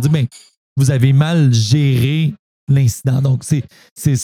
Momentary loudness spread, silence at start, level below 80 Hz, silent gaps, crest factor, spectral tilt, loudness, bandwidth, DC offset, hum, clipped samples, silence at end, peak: 9 LU; 0 s; -48 dBFS; 0.57-0.76 s, 2.39-2.67 s, 3.91-3.96 s; 14 dB; -6 dB/octave; -15 LUFS; 15 kHz; under 0.1%; none; under 0.1%; 0 s; -2 dBFS